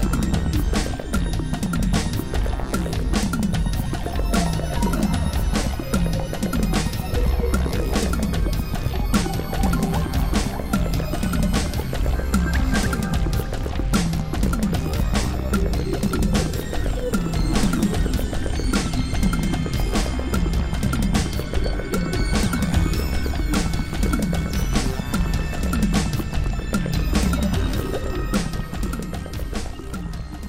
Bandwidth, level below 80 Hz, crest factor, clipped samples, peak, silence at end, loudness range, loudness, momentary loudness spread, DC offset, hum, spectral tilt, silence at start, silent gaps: 16 kHz; -24 dBFS; 16 dB; under 0.1%; -6 dBFS; 0 s; 1 LU; -23 LUFS; 4 LU; under 0.1%; none; -5.5 dB/octave; 0 s; none